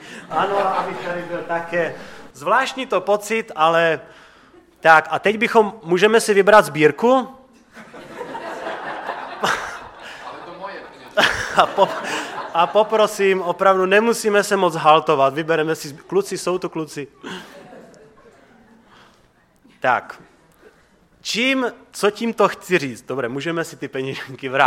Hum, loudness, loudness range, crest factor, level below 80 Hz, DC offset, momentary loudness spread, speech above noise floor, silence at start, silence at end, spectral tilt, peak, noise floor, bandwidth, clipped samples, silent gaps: none; -19 LUFS; 12 LU; 20 dB; -58 dBFS; under 0.1%; 18 LU; 38 dB; 0 s; 0 s; -4 dB/octave; 0 dBFS; -56 dBFS; 16.5 kHz; under 0.1%; none